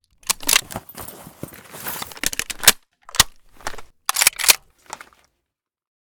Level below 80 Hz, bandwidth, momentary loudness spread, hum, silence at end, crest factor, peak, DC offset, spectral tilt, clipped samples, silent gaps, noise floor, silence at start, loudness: -44 dBFS; over 20 kHz; 23 LU; none; 1.5 s; 24 dB; 0 dBFS; under 0.1%; 0.5 dB/octave; under 0.1%; none; -82 dBFS; 0.3 s; -18 LUFS